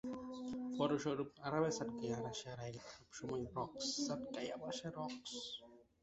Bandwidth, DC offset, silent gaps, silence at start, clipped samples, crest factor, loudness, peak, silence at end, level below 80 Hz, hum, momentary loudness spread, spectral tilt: 8 kHz; under 0.1%; none; 0.05 s; under 0.1%; 20 dB; -43 LUFS; -24 dBFS; 0.2 s; -72 dBFS; none; 11 LU; -4.5 dB/octave